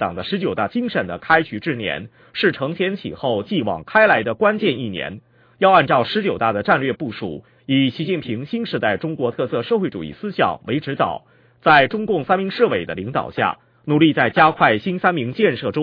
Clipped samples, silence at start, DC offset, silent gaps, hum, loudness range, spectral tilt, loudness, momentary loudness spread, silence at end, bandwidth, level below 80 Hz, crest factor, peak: under 0.1%; 0 s; under 0.1%; none; none; 4 LU; -8.5 dB/octave; -19 LUFS; 11 LU; 0 s; 5.2 kHz; -56 dBFS; 18 dB; 0 dBFS